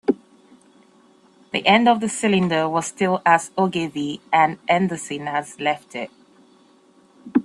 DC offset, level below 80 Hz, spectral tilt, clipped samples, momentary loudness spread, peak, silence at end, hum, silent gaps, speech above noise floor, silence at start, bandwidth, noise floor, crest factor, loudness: under 0.1%; -64 dBFS; -4.5 dB/octave; under 0.1%; 12 LU; -2 dBFS; 0 s; none; none; 34 dB; 0.1 s; 12.5 kHz; -55 dBFS; 20 dB; -20 LUFS